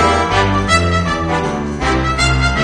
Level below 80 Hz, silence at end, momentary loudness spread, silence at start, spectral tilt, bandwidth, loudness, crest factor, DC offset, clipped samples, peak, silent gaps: -24 dBFS; 0 s; 5 LU; 0 s; -5 dB/octave; 10 kHz; -15 LUFS; 14 dB; under 0.1%; under 0.1%; 0 dBFS; none